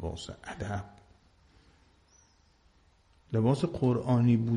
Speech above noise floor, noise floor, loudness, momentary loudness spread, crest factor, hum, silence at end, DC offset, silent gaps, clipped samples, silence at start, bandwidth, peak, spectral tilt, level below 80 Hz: 36 dB; -65 dBFS; -30 LUFS; 16 LU; 18 dB; none; 0 s; under 0.1%; none; under 0.1%; 0 s; 10 kHz; -12 dBFS; -8 dB/octave; -54 dBFS